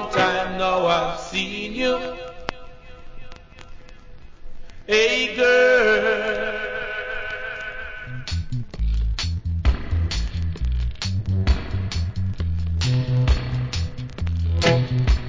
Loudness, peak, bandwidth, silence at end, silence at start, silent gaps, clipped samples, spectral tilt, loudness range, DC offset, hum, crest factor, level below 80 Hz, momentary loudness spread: -22 LUFS; -4 dBFS; 7.6 kHz; 0 s; 0 s; none; under 0.1%; -5.5 dB/octave; 8 LU; under 0.1%; none; 18 dB; -28 dBFS; 13 LU